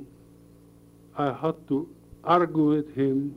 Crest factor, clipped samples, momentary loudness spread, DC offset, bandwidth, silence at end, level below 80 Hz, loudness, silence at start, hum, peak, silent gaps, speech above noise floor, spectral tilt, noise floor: 18 dB; under 0.1%; 14 LU; under 0.1%; 10.5 kHz; 0 s; -60 dBFS; -26 LUFS; 0 s; none; -8 dBFS; none; 28 dB; -8.5 dB/octave; -53 dBFS